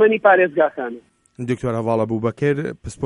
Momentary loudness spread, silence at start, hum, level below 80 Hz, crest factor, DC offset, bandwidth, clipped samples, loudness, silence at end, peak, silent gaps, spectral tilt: 16 LU; 0 s; none; -50 dBFS; 18 dB; under 0.1%; 11 kHz; under 0.1%; -19 LUFS; 0 s; 0 dBFS; none; -7 dB/octave